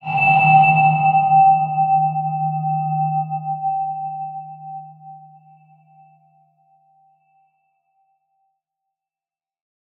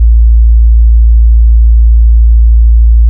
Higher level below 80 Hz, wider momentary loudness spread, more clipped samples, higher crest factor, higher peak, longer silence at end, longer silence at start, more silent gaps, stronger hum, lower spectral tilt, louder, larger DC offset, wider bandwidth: second, -70 dBFS vs -4 dBFS; first, 20 LU vs 0 LU; second, under 0.1% vs 0.2%; first, 18 dB vs 4 dB; about the same, -2 dBFS vs 0 dBFS; first, 4.8 s vs 0 s; about the same, 0.05 s vs 0 s; neither; neither; second, -9.5 dB/octave vs -16.5 dB/octave; second, -16 LUFS vs -7 LUFS; neither; first, 4.3 kHz vs 0.2 kHz